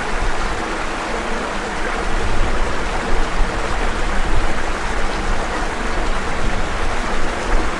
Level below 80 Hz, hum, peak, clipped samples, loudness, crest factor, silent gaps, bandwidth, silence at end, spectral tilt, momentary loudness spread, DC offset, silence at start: -20 dBFS; none; -4 dBFS; under 0.1%; -22 LUFS; 14 dB; none; 11 kHz; 0 s; -4 dB/octave; 1 LU; under 0.1%; 0 s